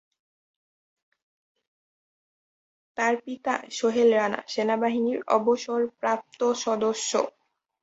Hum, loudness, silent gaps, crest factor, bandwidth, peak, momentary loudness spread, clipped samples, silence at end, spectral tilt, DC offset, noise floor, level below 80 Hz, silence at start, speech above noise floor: none; -25 LUFS; none; 20 dB; 8 kHz; -8 dBFS; 8 LU; under 0.1%; 0.55 s; -3.5 dB/octave; under 0.1%; under -90 dBFS; -74 dBFS; 2.95 s; over 65 dB